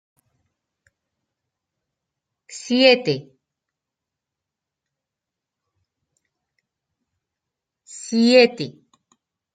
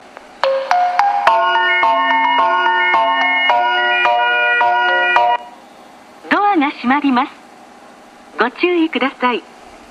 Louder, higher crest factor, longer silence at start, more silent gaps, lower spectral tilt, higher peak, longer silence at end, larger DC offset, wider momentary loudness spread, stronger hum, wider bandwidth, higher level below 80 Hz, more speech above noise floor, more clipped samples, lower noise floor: second, -17 LUFS vs -14 LUFS; first, 24 dB vs 16 dB; first, 2.5 s vs 0.4 s; neither; about the same, -4 dB/octave vs -3 dB/octave; about the same, -2 dBFS vs 0 dBFS; first, 0.85 s vs 0.15 s; neither; first, 22 LU vs 6 LU; neither; second, 9.2 kHz vs 11 kHz; second, -74 dBFS vs -62 dBFS; first, 69 dB vs 25 dB; neither; first, -86 dBFS vs -41 dBFS